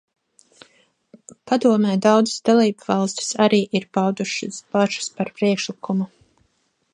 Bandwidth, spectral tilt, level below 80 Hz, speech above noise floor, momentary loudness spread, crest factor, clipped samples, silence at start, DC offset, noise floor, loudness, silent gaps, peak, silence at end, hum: 10.5 kHz; -5 dB/octave; -68 dBFS; 48 dB; 8 LU; 18 dB; under 0.1%; 1.45 s; under 0.1%; -67 dBFS; -20 LUFS; none; -2 dBFS; 0.85 s; none